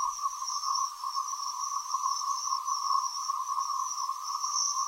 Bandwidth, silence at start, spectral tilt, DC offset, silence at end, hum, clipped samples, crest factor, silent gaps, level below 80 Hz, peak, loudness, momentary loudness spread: 16 kHz; 0 s; 7 dB/octave; under 0.1%; 0 s; none; under 0.1%; 16 dB; none; -78 dBFS; -16 dBFS; -31 LUFS; 4 LU